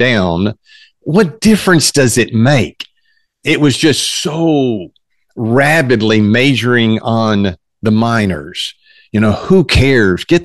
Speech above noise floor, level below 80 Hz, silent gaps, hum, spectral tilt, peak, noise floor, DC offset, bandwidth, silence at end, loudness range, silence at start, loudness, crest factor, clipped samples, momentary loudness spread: 49 dB; -34 dBFS; none; none; -5 dB/octave; 0 dBFS; -60 dBFS; 0.9%; 12.5 kHz; 0 s; 2 LU; 0 s; -12 LUFS; 12 dB; under 0.1%; 11 LU